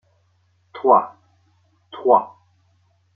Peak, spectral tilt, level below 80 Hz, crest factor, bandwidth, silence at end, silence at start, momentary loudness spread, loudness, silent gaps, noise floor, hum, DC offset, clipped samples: -2 dBFS; -8.5 dB/octave; -76 dBFS; 20 dB; 4.4 kHz; 0.9 s; 0.75 s; 24 LU; -18 LUFS; none; -62 dBFS; none; under 0.1%; under 0.1%